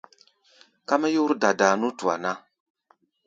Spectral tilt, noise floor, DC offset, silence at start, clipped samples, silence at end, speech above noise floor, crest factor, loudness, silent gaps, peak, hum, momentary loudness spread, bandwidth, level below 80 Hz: -4 dB/octave; -65 dBFS; under 0.1%; 0.9 s; under 0.1%; 0.9 s; 43 dB; 22 dB; -23 LUFS; none; -4 dBFS; none; 12 LU; 7.8 kHz; -76 dBFS